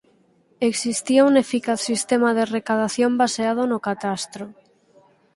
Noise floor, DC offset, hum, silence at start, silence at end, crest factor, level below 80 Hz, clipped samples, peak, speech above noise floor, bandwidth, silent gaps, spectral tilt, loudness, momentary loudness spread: -59 dBFS; under 0.1%; none; 0.6 s; 0.85 s; 18 dB; -66 dBFS; under 0.1%; -4 dBFS; 39 dB; 11.5 kHz; none; -3.5 dB/octave; -21 LUFS; 10 LU